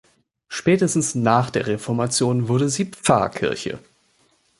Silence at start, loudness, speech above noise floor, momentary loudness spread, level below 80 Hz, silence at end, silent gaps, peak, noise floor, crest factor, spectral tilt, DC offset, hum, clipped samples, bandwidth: 0.5 s; -21 LUFS; 42 dB; 8 LU; -54 dBFS; 0.8 s; none; -2 dBFS; -62 dBFS; 20 dB; -5 dB/octave; under 0.1%; none; under 0.1%; 11.5 kHz